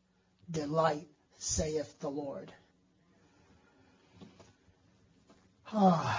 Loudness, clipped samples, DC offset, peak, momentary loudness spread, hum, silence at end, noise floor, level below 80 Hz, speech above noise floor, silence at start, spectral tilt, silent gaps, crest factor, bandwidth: -34 LUFS; under 0.1%; under 0.1%; -14 dBFS; 26 LU; none; 0 s; -69 dBFS; -58 dBFS; 37 dB; 0.5 s; -5 dB/octave; none; 22 dB; 7.6 kHz